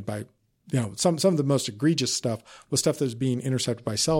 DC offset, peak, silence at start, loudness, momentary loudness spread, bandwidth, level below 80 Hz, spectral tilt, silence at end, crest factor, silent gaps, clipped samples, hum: under 0.1%; -10 dBFS; 0 s; -26 LUFS; 10 LU; 16.5 kHz; -60 dBFS; -4.5 dB/octave; 0 s; 16 dB; none; under 0.1%; none